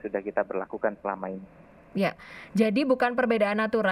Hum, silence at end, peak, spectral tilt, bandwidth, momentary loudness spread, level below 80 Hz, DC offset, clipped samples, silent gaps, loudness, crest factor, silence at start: none; 0 s; -10 dBFS; -7 dB/octave; 13.5 kHz; 12 LU; -64 dBFS; under 0.1%; under 0.1%; none; -27 LUFS; 18 dB; 0.05 s